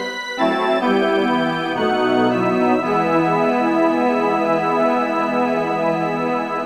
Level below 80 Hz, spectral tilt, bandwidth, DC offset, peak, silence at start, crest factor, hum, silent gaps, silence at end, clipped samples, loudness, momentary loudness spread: -62 dBFS; -6 dB/octave; 12 kHz; 0.2%; -6 dBFS; 0 s; 12 dB; none; none; 0 s; under 0.1%; -18 LUFS; 3 LU